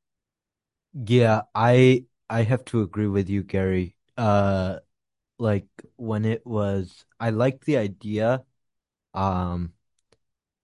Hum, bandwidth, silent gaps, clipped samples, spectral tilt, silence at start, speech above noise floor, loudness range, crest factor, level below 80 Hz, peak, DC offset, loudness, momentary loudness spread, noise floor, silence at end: none; 11.5 kHz; none; under 0.1%; -8 dB/octave; 0.95 s; 66 dB; 5 LU; 20 dB; -46 dBFS; -4 dBFS; under 0.1%; -24 LUFS; 13 LU; -88 dBFS; 0.95 s